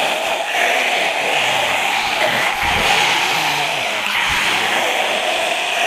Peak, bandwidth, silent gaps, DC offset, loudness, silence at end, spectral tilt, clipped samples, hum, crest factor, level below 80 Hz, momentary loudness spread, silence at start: -2 dBFS; 15.5 kHz; none; under 0.1%; -16 LUFS; 0 s; -1 dB/octave; under 0.1%; none; 16 dB; -44 dBFS; 3 LU; 0 s